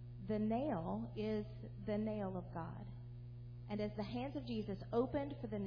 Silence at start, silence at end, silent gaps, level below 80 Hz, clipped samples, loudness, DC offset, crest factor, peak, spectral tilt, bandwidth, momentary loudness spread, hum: 0 s; 0 s; none; -60 dBFS; under 0.1%; -43 LUFS; under 0.1%; 16 dB; -26 dBFS; -7 dB/octave; 5.2 kHz; 13 LU; 60 Hz at -50 dBFS